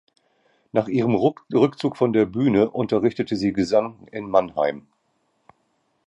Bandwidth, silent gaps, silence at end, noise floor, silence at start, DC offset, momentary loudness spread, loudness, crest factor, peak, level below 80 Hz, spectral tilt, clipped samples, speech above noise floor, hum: 9.6 kHz; none; 1.3 s; -69 dBFS; 0.75 s; under 0.1%; 6 LU; -22 LUFS; 18 dB; -4 dBFS; -56 dBFS; -7.5 dB/octave; under 0.1%; 48 dB; none